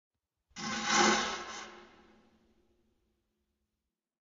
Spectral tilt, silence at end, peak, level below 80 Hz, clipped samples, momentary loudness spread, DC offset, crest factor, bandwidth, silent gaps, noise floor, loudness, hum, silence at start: -0.5 dB/octave; 2.35 s; -14 dBFS; -70 dBFS; under 0.1%; 22 LU; under 0.1%; 24 dB; 7.4 kHz; none; -89 dBFS; -30 LUFS; none; 0.55 s